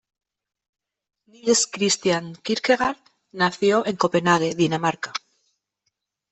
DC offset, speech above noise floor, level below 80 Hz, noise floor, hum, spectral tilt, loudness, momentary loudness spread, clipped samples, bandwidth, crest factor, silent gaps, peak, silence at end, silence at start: under 0.1%; 55 dB; -64 dBFS; -77 dBFS; none; -3.5 dB/octave; -22 LUFS; 11 LU; under 0.1%; 8.4 kHz; 20 dB; none; -4 dBFS; 1.15 s; 1.45 s